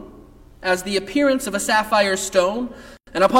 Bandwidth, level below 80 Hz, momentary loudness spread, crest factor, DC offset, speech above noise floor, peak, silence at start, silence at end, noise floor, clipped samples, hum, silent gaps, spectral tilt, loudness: 17 kHz; -48 dBFS; 11 LU; 18 dB; under 0.1%; 26 dB; -4 dBFS; 0 s; 0 s; -45 dBFS; under 0.1%; none; none; -3 dB/octave; -20 LUFS